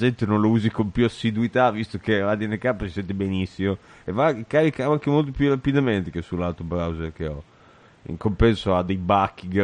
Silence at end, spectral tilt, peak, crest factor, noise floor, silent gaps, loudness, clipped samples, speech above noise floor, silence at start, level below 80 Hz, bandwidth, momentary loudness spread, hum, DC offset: 0 s; -8 dB/octave; -4 dBFS; 18 dB; -52 dBFS; none; -23 LUFS; under 0.1%; 30 dB; 0 s; -40 dBFS; 10 kHz; 9 LU; none; under 0.1%